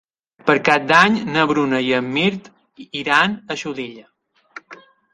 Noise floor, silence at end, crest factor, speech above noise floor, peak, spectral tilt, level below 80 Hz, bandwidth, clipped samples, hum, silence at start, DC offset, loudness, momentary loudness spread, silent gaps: -45 dBFS; 0.4 s; 20 dB; 27 dB; 0 dBFS; -5 dB/octave; -60 dBFS; 11.5 kHz; under 0.1%; none; 0.45 s; under 0.1%; -17 LUFS; 18 LU; none